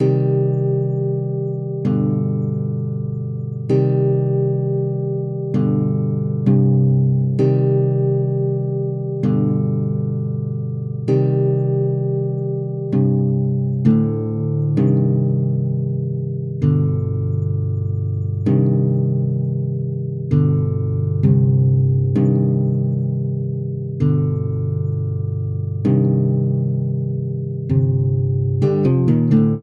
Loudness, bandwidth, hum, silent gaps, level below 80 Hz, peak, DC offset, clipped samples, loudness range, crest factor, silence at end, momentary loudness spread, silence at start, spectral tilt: -19 LUFS; 3 kHz; none; none; -50 dBFS; -4 dBFS; under 0.1%; under 0.1%; 3 LU; 14 dB; 0 s; 7 LU; 0 s; -12 dB/octave